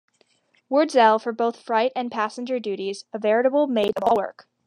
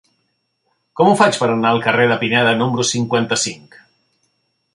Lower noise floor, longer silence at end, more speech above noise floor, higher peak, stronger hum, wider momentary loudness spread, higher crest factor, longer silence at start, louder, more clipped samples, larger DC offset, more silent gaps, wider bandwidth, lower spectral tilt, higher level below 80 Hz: second, -64 dBFS vs -68 dBFS; second, 0.25 s vs 1.15 s; second, 42 dB vs 53 dB; about the same, -4 dBFS vs -2 dBFS; neither; first, 11 LU vs 7 LU; about the same, 18 dB vs 16 dB; second, 0.7 s vs 0.95 s; second, -22 LUFS vs -15 LUFS; neither; neither; neither; about the same, 10.5 kHz vs 11.5 kHz; about the same, -4.5 dB/octave vs -4 dB/octave; second, -68 dBFS vs -60 dBFS